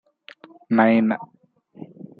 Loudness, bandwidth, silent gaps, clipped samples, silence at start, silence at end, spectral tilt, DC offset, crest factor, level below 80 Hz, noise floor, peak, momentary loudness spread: -20 LUFS; 4.8 kHz; none; under 0.1%; 0.7 s; 0.35 s; -9.5 dB/octave; under 0.1%; 20 dB; -74 dBFS; -50 dBFS; -4 dBFS; 24 LU